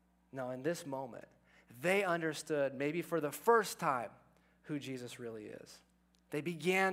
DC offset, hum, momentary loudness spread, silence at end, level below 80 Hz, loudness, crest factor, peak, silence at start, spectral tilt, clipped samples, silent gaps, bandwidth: under 0.1%; none; 18 LU; 0 s; -78 dBFS; -37 LUFS; 22 dB; -16 dBFS; 0.35 s; -4.5 dB/octave; under 0.1%; none; 16 kHz